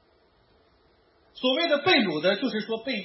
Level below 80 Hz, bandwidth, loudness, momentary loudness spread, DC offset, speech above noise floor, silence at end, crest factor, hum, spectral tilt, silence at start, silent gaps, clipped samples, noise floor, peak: -72 dBFS; 6 kHz; -24 LUFS; 9 LU; under 0.1%; 38 dB; 0 s; 18 dB; none; -8 dB/octave; 1.35 s; none; under 0.1%; -63 dBFS; -8 dBFS